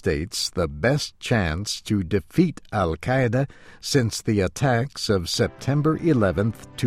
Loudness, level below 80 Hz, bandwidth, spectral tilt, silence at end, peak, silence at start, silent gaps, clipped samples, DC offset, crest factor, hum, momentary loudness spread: -23 LUFS; -42 dBFS; 15.5 kHz; -5.5 dB/octave; 0 s; -6 dBFS; 0.05 s; none; under 0.1%; under 0.1%; 16 dB; none; 5 LU